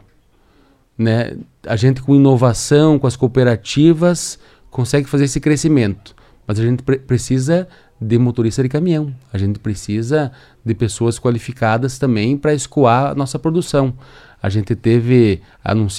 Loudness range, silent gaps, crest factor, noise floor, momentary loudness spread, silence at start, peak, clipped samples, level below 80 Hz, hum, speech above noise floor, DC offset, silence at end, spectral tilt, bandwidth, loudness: 5 LU; none; 16 dB; -53 dBFS; 12 LU; 1 s; 0 dBFS; under 0.1%; -42 dBFS; none; 38 dB; under 0.1%; 0 s; -6.5 dB/octave; 13 kHz; -16 LUFS